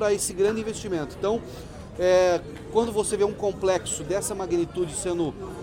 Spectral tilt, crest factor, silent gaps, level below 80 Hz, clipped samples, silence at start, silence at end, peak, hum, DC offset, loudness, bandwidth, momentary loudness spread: -4.5 dB/octave; 16 dB; none; -48 dBFS; under 0.1%; 0 s; 0 s; -8 dBFS; none; under 0.1%; -25 LUFS; 17 kHz; 9 LU